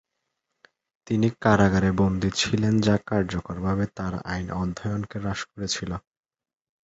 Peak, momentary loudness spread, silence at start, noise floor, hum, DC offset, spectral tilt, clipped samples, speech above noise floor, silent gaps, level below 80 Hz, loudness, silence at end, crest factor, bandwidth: -4 dBFS; 10 LU; 1.05 s; -80 dBFS; none; under 0.1%; -5.5 dB/octave; under 0.1%; 56 dB; none; -44 dBFS; -25 LUFS; 0.85 s; 22 dB; 8.2 kHz